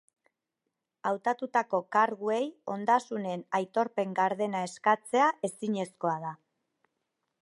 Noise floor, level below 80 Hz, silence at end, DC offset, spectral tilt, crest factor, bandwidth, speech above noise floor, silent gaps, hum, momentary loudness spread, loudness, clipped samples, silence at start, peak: -85 dBFS; -86 dBFS; 1.1 s; under 0.1%; -5 dB/octave; 20 dB; 11.5 kHz; 56 dB; none; none; 8 LU; -30 LUFS; under 0.1%; 1.05 s; -10 dBFS